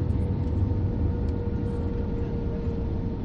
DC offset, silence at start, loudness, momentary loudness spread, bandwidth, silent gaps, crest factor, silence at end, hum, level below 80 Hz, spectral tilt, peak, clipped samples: under 0.1%; 0 s; -28 LUFS; 3 LU; 5.6 kHz; none; 12 dB; 0 s; none; -32 dBFS; -10.5 dB/octave; -14 dBFS; under 0.1%